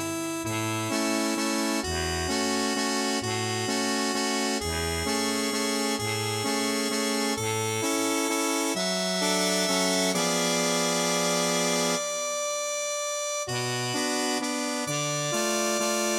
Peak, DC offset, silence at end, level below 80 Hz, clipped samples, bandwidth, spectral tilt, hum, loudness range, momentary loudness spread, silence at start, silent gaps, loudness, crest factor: -12 dBFS; under 0.1%; 0 s; -52 dBFS; under 0.1%; 16.5 kHz; -2.5 dB/octave; none; 3 LU; 4 LU; 0 s; none; -26 LUFS; 16 dB